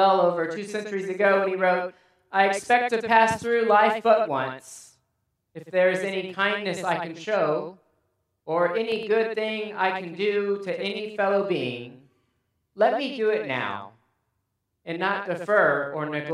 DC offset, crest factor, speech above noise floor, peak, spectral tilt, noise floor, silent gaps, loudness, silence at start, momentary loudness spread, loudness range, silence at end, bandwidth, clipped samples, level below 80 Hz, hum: under 0.1%; 22 dB; 53 dB; -2 dBFS; -4.5 dB/octave; -77 dBFS; none; -24 LUFS; 0 s; 12 LU; 6 LU; 0 s; 13 kHz; under 0.1%; -72 dBFS; none